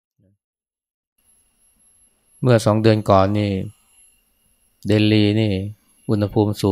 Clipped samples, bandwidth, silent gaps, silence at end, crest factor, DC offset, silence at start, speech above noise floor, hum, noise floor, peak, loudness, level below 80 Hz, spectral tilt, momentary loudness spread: under 0.1%; 14 kHz; none; 0 s; 20 dB; under 0.1%; 2.4 s; 46 dB; none; -62 dBFS; 0 dBFS; -18 LUFS; -54 dBFS; -7 dB/octave; 16 LU